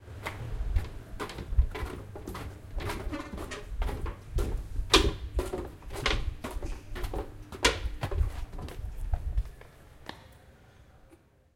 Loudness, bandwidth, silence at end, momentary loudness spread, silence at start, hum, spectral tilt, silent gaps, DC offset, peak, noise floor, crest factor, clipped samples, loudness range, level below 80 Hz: -34 LUFS; 16.5 kHz; 0.4 s; 15 LU; 0 s; none; -4 dB/octave; none; under 0.1%; -6 dBFS; -60 dBFS; 28 dB; under 0.1%; 7 LU; -36 dBFS